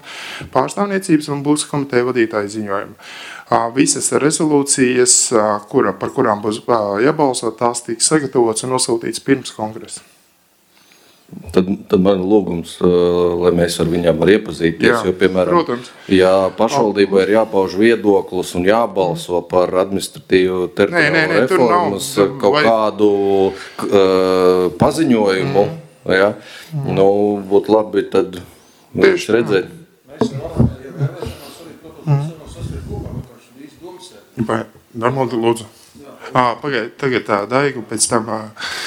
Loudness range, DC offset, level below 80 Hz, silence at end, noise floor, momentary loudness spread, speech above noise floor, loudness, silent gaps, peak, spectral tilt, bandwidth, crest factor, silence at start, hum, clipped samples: 8 LU; under 0.1%; -46 dBFS; 0 s; -55 dBFS; 14 LU; 40 dB; -15 LUFS; none; 0 dBFS; -4.5 dB/octave; 16.5 kHz; 16 dB; 0.05 s; none; under 0.1%